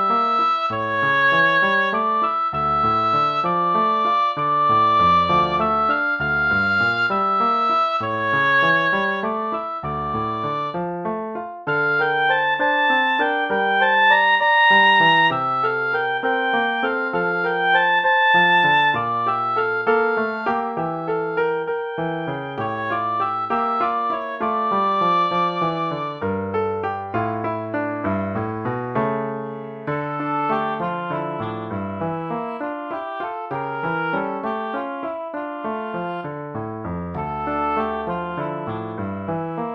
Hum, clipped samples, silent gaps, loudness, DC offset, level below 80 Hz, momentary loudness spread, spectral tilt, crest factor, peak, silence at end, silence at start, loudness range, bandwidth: none; under 0.1%; none; -20 LUFS; under 0.1%; -52 dBFS; 12 LU; -6.5 dB/octave; 16 dB; -4 dBFS; 0 s; 0 s; 10 LU; 7.4 kHz